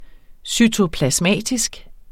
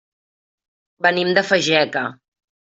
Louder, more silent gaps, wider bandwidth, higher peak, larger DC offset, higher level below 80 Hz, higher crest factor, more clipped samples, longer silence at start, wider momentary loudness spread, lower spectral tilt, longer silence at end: about the same, -18 LUFS vs -18 LUFS; neither; first, 16.5 kHz vs 8.2 kHz; about the same, -2 dBFS vs -2 dBFS; neither; first, -40 dBFS vs -66 dBFS; about the same, 18 dB vs 20 dB; neither; second, 0 s vs 1 s; about the same, 8 LU vs 8 LU; about the same, -3.5 dB/octave vs -3.5 dB/octave; second, 0 s vs 0.5 s